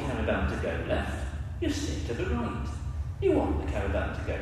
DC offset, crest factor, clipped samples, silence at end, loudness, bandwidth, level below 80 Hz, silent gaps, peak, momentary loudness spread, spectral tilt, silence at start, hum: under 0.1%; 16 dB; under 0.1%; 0 s; -31 LUFS; 12.5 kHz; -36 dBFS; none; -14 dBFS; 8 LU; -6.5 dB/octave; 0 s; none